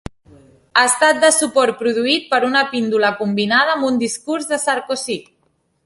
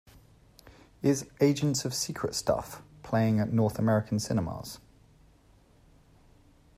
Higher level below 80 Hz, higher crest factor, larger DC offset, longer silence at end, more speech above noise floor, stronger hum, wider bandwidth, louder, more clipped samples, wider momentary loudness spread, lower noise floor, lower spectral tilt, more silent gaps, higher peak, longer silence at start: first, -52 dBFS vs -58 dBFS; about the same, 16 dB vs 20 dB; neither; second, 0.65 s vs 2 s; first, 47 dB vs 32 dB; neither; second, 12 kHz vs 15.5 kHz; first, -16 LUFS vs -29 LUFS; neither; second, 9 LU vs 15 LU; first, -64 dBFS vs -60 dBFS; second, -2.5 dB/octave vs -5.5 dB/octave; neither; first, 0 dBFS vs -10 dBFS; about the same, 0.75 s vs 0.65 s